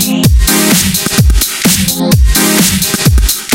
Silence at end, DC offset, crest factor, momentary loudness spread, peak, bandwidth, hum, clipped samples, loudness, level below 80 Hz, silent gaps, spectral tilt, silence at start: 0 s; under 0.1%; 8 dB; 3 LU; 0 dBFS; 17.5 kHz; none; 0.2%; -9 LUFS; -14 dBFS; none; -3.5 dB/octave; 0 s